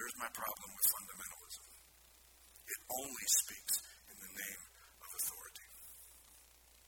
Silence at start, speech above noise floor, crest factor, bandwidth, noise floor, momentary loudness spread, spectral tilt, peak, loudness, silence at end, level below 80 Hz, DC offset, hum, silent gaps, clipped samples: 0 s; 26 dB; 26 dB; 19 kHz; -65 dBFS; 24 LU; 1 dB/octave; -16 dBFS; -38 LUFS; 0 s; -72 dBFS; under 0.1%; none; none; under 0.1%